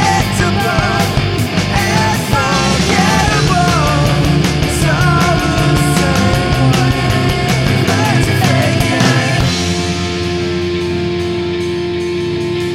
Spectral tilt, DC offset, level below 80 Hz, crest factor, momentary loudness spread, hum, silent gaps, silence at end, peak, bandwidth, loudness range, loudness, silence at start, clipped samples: -5 dB/octave; under 0.1%; -26 dBFS; 12 dB; 6 LU; none; none; 0 s; 0 dBFS; 16.5 kHz; 3 LU; -13 LUFS; 0 s; under 0.1%